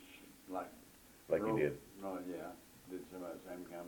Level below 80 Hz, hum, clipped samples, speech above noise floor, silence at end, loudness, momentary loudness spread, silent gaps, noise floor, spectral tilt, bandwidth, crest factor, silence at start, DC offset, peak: -70 dBFS; none; under 0.1%; 21 dB; 0 s; -42 LUFS; 21 LU; none; -61 dBFS; -6.5 dB/octave; 19 kHz; 22 dB; 0 s; under 0.1%; -20 dBFS